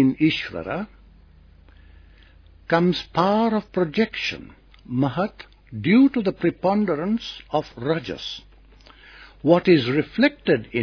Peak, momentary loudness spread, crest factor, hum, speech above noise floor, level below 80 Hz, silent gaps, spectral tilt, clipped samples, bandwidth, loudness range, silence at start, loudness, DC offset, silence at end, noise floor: -2 dBFS; 14 LU; 20 dB; none; 29 dB; -52 dBFS; none; -7 dB/octave; under 0.1%; 5.4 kHz; 3 LU; 0 s; -22 LUFS; under 0.1%; 0 s; -50 dBFS